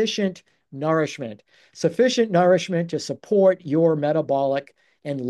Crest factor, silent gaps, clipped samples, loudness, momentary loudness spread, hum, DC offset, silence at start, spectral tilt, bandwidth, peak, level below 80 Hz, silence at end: 16 dB; none; under 0.1%; -21 LUFS; 12 LU; none; under 0.1%; 0 s; -5.5 dB/octave; 11.5 kHz; -6 dBFS; -72 dBFS; 0 s